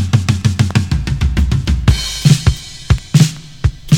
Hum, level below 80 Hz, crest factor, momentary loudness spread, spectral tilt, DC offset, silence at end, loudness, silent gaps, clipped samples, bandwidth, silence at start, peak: none; -20 dBFS; 14 dB; 7 LU; -5.5 dB/octave; under 0.1%; 0 s; -15 LUFS; none; 0.2%; 16.5 kHz; 0 s; 0 dBFS